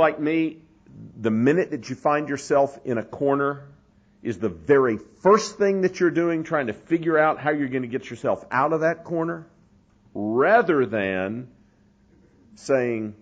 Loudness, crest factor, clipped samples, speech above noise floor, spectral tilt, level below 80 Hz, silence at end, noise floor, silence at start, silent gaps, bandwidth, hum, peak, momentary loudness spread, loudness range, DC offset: -23 LUFS; 18 dB; under 0.1%; 36 dB; -6.5 dB/octave; -62 dBFS; 0.05 s; -58 dBFS; 0 s; none; 9.4 kHz; none; -6 dBFS; 11 LU; 3 LU; under 0.1%